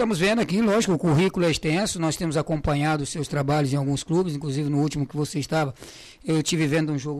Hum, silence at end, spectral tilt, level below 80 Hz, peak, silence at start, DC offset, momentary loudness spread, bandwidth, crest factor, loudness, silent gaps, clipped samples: none; 0 s; -5.5 dB/octave; -46 dBFS; -12 dBFS; 0 s; under 0.1%; 6 LU; 14.5 kHz; 12 dB; -24 LUFS; none; under 0.1%